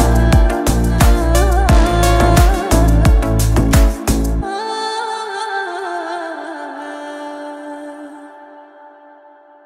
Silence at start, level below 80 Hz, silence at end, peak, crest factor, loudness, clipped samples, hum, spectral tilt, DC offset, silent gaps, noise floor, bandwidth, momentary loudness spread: 0 s; -16 dBFS; 0.8 s; 0 dBFS; 14 dB; -15 LUFS; under 0.1%; none; -5.5 dB/octave; under 0.1%; none; -44 dBFS; 16 kHz; 16 LU